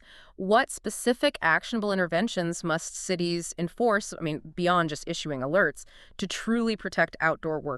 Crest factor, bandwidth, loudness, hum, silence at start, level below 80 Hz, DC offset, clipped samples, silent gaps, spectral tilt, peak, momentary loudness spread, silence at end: 20 dB; 13.5 kHz; -27 LUFS; none; 0.1 s; -56 dBFS; under 0.1%; under 0.1%; none; -4 dB/octave; -8 dBFS; 9 LU; 0 s